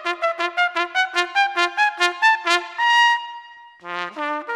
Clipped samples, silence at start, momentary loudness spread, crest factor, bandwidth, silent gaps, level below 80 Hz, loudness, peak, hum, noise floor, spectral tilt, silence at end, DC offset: under 0.1%; 0 s; 14 LU; 20 dB; 13.5 kHz; none; -70 dBFS; -19 LUFS; 0 dBFS; none; -41 dBFS; 0 dB/octave; 0 s; under 0.1%